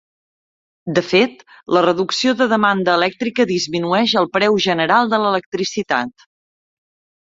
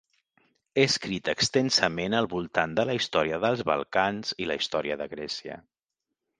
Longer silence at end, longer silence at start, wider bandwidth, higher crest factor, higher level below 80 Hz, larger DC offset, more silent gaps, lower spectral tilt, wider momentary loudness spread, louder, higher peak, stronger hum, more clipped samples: first, 1.1 s vs 0.8 s; about the same, 0.85 s vs 0.75 s; second, 7.8 kHz vs 10 kHz; second, 16 dB vs 24 dB; about the same, -60 dBFS vs -60 dBFS; neither; first, 5.46-5.52 s vs none; about the same, -4.5 dB/octave vs -3.5 dB/octave; second, 6 LU vs 10 LU; first, -17 LUFS vs -27 LUFS; about the same, -2 dBFS vs -4 dBFS; neither; neither